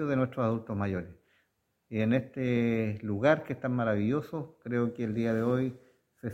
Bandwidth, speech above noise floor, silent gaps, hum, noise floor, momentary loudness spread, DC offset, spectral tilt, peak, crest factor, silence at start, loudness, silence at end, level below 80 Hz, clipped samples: 7.8 kHz; 47 dB; none; none; -76 dBFS; 10 LU; under 0.1%; -8.5 dB/octave; -10 dBFS; 20 dB; 0 s; -31 LUFS; 0 s; -64 dBFS; under 0.1%